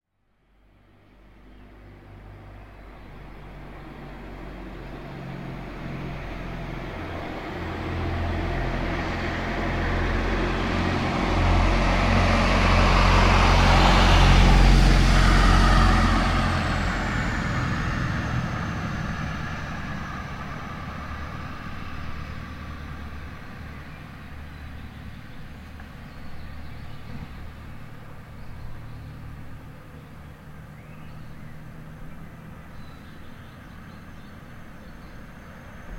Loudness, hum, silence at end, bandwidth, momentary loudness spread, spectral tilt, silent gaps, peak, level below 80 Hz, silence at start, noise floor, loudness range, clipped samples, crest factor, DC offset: -23 LUFS; none; 0 s; 11 kHz; 25 LU; -5.5 dB/octave; none; -4 dBFS; -28 dBFS; 1.45 s; -67 dBFS; 24 LU; under 0.1%; 22 dB; under 0.1%